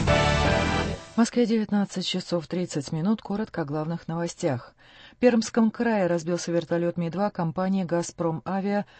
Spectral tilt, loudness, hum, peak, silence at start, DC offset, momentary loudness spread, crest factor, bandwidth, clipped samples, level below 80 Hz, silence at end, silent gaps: -5.5 dB/octave; -26 LUFS; none; -6 dBFS; 0 s; under 0.1%; 8 LU; 18 dB; 8.8 kHz; under 0.1%; -42 dBFS; 0.15 s; none